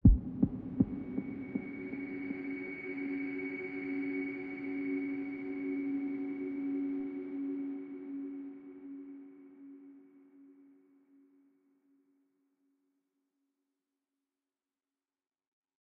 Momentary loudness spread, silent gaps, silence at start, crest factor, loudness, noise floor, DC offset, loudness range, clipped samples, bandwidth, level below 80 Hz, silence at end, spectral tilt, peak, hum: 15 LU; none; 0.05 s; 26 dB; -38 LUFS; under -90 dBFS; under 0.1%; 16 LU; under 0.1%; 4.7 kHz; -44 dBFS; 5.35 s; -9.5 dB/octave; -12 dBFS; none